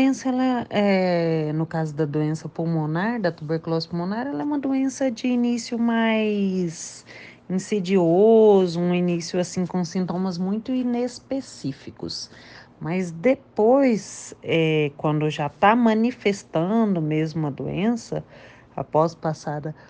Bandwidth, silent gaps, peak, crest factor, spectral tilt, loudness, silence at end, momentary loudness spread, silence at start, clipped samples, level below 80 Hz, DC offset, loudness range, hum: 9.6 kHz; none; -4 dBFS; 18 dB; -6.5 dB/octave; -23 LUFS; 0.15 s; 13 LU; 0 s; under 0.1%; -62 dBFS; under 0.1%; 6 LU; none